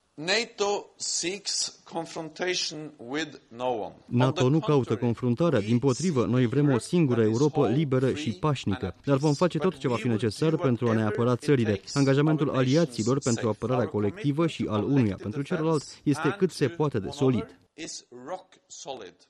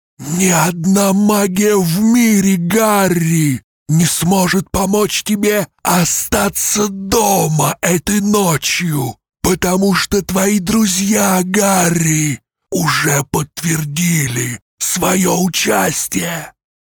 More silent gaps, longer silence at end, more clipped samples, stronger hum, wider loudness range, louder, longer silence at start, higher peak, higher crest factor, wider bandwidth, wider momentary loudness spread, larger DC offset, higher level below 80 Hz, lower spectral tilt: second, none vs 3.64-3.86 s, 14.62-14.78 s; second, 0.2 s vs 0.4 s; neither; neither; about the same, 5 LU vs 3 LU; second, -26 LUFS vs -14 LUFS; about the same, 0.2 s vs 0.2 s; second, -10 dBFS vs 0 dBFS; about the same, 16 dB vs 14 dB; second, 12 kHz vs over 20 kHz; first, 12 LU vs 6 LU; neither; second, -62 dBFS vs -40 dBFS; first, -5.5 dB/octave vs -4 dB/octave